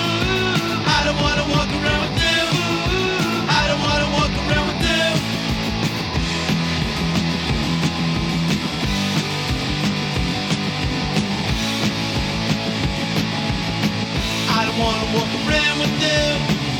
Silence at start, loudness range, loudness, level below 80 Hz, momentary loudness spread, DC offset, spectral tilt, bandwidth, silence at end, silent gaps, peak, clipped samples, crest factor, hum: 0 s; 3 LU; -19 LUFS; -32 dBFS; 4 LU; under 0.1%; -4.5 dB/octave; 19 kHz; 0 s; none; -4 dBFS; under 0.1%; 16 dB; none